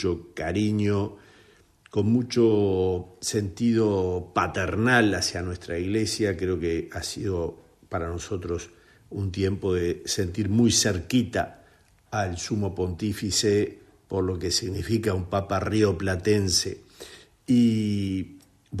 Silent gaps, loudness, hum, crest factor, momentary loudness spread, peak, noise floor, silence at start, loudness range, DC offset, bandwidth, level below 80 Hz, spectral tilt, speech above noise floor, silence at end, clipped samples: none; -25 LUFS; none; 20 dB; 12 LU; -6 dBFS; -58 dBFS; 0 s; 5 LU; under 0.1%; 13.5 kHz; -54 dBFS; -5 dB/octave; 33 dB; 0 s; under 0.1%